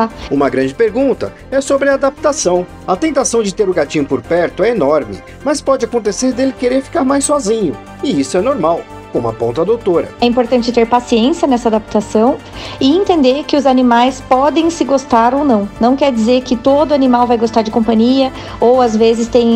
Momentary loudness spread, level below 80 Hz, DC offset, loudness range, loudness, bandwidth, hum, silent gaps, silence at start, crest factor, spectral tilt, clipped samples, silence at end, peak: 6 LU; -40 dBFS; 0.1%; 3 LU; -13 LUFS; 12.5 kHz; none; none; 0 s; 12 dB; -4.5 dB/octave; under 0.1%; 0 s; 0 dBFS